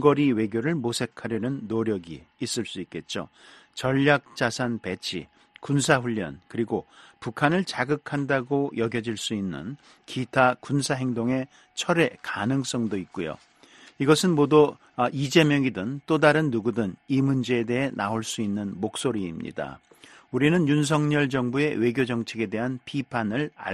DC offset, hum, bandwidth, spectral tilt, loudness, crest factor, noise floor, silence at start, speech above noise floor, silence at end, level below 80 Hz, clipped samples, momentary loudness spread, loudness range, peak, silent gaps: under 0.1%; none; 13 kHz; -5.5 dB/octave; -25 LUFS; 22 dB; -53 dBFS; 0 s; 28 dB; 0 s; -60 dBFS; under 0.1%; 13 LU; 5 LU; -2 dBFS; none